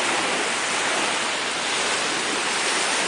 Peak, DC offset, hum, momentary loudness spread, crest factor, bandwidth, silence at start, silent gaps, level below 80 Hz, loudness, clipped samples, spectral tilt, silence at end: -10 dBFS; under 0.1%; none; 2 LU; 14 dB; 10.5 kHz; 0 s; none; -68 dBFS; -22 LUFS; under 0.1%; -0.5 dB/octave; 0 s